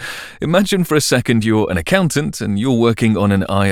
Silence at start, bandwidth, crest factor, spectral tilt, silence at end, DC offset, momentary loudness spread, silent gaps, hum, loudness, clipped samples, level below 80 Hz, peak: 0 s; 17 kHz; 14 dB; -5.5 dB/octave; 0 s; under 0.1%; 5 LU; none; none; -15 LUFS; under 0.1%; -44 dBFS; 0 dBFS